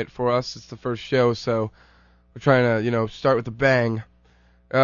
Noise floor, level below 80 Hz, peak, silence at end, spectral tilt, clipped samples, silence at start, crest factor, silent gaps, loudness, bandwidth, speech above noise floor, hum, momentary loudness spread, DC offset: -57 dBFS; -54 dBFS; -4 dBFS; 0 s; -6.5 dB/octave; under 0.1%; 0 s; 20 dB; none; -22 LUFS; 7.2 kHz; 35 dB; none; 12 LU; under 0.1%